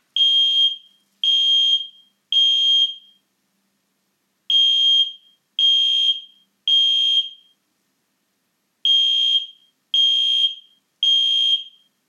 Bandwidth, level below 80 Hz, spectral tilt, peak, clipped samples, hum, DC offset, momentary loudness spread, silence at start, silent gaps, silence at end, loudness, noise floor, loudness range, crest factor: 10 kHz; under -90 dBFS; 6 dB/octave; -8 dBFS; under 0.1%; none; under 0.1%; 9 LU; 0.15 s; none; 0.4 s; -15 LUFS; -70 dBFS; 3 LU; 12 dB